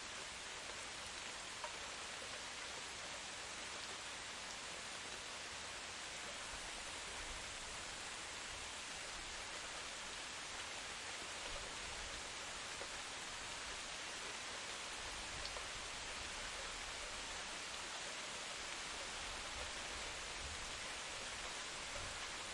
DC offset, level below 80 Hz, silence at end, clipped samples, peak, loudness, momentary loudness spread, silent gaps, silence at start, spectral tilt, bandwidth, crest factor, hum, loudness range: under 0.1%; -64 dBFS; 0 s; under 0.1%; -30 dBFS; -46 LUFS; 2 LU; none; 0 s; -0.5 dB/octave; 11.5 kHz; 18 dB; none; 1 LU